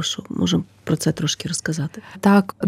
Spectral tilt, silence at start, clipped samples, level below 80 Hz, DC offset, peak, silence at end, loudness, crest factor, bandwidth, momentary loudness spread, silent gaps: -5 dB/octave; 0 s; under 0.1%; -54 dBFS; under 0.1%; -4 dBFS; 0 s; -21 LUFS; 16 dB; 16 kHz; 9 LU; none